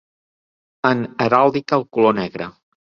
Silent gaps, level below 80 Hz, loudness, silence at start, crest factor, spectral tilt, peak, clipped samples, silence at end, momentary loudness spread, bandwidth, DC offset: none; -58 dBFS; -18 LUFS; 0.85 s; 18 dB; -7 dB/octave; -2 dBFS; under 0.1%; 0.35 s; 13 LU; 7 kHz; under 0.1%